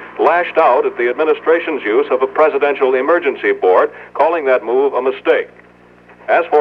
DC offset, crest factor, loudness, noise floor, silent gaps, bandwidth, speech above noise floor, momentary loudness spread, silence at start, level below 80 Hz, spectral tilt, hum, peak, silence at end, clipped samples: under 0.1%; 14 dB; -14 LUFS; -44 dBFS; none; 5.6 kHz; 30 dB; 4 LU; 0 s; -62 dBFS; -6 dB/octave; 60 Hz at -55 dBFS; 0 dBFS; 0 s; under 0.1%